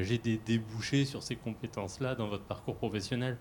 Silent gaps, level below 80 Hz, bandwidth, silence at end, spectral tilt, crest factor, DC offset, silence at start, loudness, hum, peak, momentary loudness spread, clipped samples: none; -60 dBFS; 17 kHz; 0 s; -6 dB/octave; 18 dB; under 0.1%; 0 s; -35 LUFS; none; -18 dBFS; 8 LU; under 0.1%